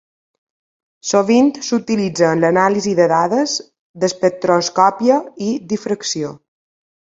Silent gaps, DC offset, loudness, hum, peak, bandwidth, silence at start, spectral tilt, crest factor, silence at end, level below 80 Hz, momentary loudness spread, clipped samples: 3.79-3.94 s; under 0.1%; -16 LUFS; none; 0 dBFS; 8 kHz; 1.05 s; -4.5 dB/octave; 16 dB; 0.75 s; -62 dBFS; 9 LU; under 0.1%